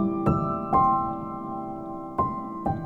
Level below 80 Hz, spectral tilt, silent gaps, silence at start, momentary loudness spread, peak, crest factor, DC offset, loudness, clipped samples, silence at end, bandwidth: -46 dBFS; -10.5 dB/octave; none; 0 s; 12 LU; -10 dBFS; 16 dB; under 0.1%; -27 LUFS; under 0.1%; 0 s; 9.4 kHz